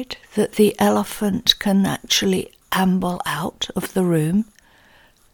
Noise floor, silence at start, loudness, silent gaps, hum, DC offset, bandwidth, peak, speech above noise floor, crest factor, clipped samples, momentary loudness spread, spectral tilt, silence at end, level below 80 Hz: -53 dBFS; 0 s; -20 LUFS; none; none; under 0.1%; 19 kHz; 0 dBFS; 33 dB; 20 dB; under 0.1%; 8 LU; -4.5 dB/octave; 0.9 s; -50 dBFS